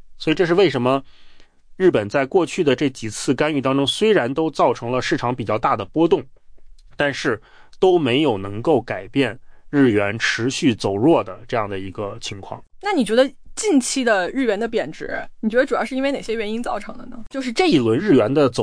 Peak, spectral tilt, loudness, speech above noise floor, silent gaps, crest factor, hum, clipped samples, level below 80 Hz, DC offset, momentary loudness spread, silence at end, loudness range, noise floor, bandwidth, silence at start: -4 dBFS; -5 dB/octave; -20 LUFS; 24 dB; none; 14 dB; none; under 0.1%; -46 dBFS; under 0.1%; 11 LU; 0 s; 2 LU; -43 dBFS; 10.5 kHz; 0.05 s